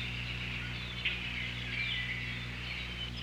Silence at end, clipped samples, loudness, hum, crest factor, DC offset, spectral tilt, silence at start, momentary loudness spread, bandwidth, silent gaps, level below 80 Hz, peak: 0 s; under 0.1%; -36 LUFS; 60 Hz at -45 dBFS; 16 dB; under 0.1%; -4 dB/octave; 0 s; 5 LU; 16 kHz; none; -48 dBFS; -22 dBFS